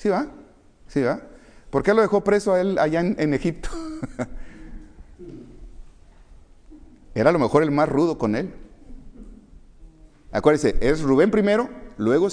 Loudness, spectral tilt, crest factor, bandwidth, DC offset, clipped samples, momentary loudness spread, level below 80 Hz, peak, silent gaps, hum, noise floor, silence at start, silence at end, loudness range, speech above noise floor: -21 LUFS; -7 dB/octave; 20 dB; 10.5 kHz; under 0.1%; under 0.1%; 16 LU; -38 dBFS; -4 dBFS; none; none; -49 dBFS; 0 s; 0 s; 10 LU; 29 dB